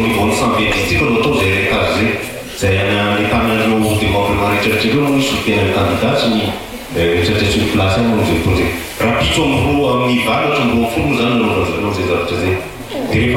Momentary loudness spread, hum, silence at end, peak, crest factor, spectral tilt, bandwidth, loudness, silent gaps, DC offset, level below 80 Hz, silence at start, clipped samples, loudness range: 4 LU; none; 0 s; -4 dBFS; 10 dB; -5.5 dB/octave; 16.5 kHz; -14 LUFS; none; under 0.1%; -32 dBFS; 0 s; under 0.1%; 1 LU